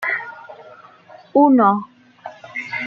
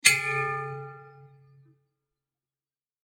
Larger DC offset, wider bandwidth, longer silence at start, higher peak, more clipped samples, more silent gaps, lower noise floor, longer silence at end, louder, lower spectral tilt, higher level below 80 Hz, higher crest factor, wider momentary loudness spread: neither; second, 6.6 kHz vs 17 kHz; about the same, 0 s vs 0.05 s; about the same, -2 dBFS vs 0 dBFS; neither; neither; second, -45 dBFS vs under -90 dBFS; second, 0 s vs 1.8 s; first, -17 LUFS vs -26 LUFS; first, -7.5 dB/octave vs -0.5 dB/octave; first, -72 dBFS vs -78 dBFS; second, 18 dB vs 32 dB; first, 26 LU vs 22 LU